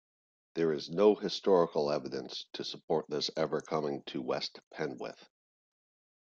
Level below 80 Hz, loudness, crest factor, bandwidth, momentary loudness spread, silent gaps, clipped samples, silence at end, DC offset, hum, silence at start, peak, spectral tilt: -76 dBFS; -33 LUFS; 22 dB; 7.6 kHz; 13 LU; 2.84-2.88 s, 4.67-4.71 s; under 0.1%; 1.05 s; under 0.1%; none; 0.55 s; -12 dBFS; -5 dB/octave